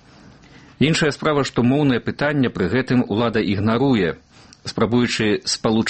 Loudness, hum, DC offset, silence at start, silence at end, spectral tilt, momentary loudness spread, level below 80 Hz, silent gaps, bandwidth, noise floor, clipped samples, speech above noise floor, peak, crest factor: -19 LUFS; none; under 0.1%; 0.8 s; 0 s; -5.5 dB/octave; 4 LU; -48 dBFS; none; 8.8 kHz; -46 dBFS; under 0.1%; 28 dB; -4 dBFS; 16 dB